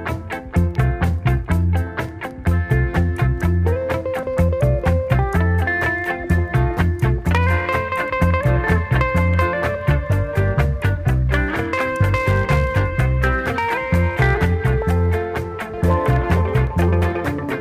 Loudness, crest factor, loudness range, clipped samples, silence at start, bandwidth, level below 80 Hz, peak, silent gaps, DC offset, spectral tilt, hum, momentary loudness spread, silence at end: -19 LUFS; 14 dB; 2 LU; under 0.1%; 0 s; 15 kHz; -26 dBFS; -4 dBFS; none; under 0.1%; -7.5 dB/octave; none; 5 LU; 0 s